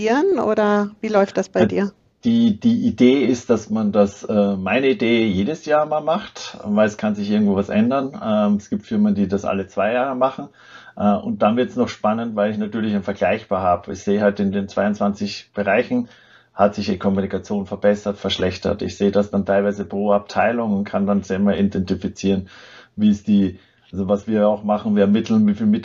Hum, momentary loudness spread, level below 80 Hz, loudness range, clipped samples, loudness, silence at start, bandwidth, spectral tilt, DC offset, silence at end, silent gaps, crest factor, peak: none; 7 LU; -54 dBFS; 3 LU; under 0.1%; -19 LUFS; 0 s; 7.6 kHz; -7 dB/octave; under 0.1%; 0 s; none; 18 dB; -2 dBFS